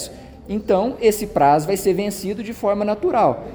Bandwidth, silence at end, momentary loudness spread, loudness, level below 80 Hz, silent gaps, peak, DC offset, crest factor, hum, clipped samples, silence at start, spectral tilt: over 20 kHz; 0 s; 11 LU; -19 LUFS; -46 dBFS; none; -4 dBFS; under 0.1%; 16 dB; none; under 0.1%; 0 s; -5.5 dB/octave